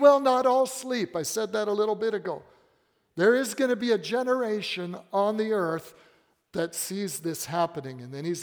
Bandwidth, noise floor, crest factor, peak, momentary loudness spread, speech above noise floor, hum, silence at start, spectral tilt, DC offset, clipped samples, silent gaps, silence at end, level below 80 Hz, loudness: over 20 kHz; -69 dBFS; 20 dB; -6 dBFS; 12 LU; 42 dB; none; 0 s; -4 dB/octave; under 0.1%; under 0.1%; none; 0 s; -74 dBFS; -27 LUFS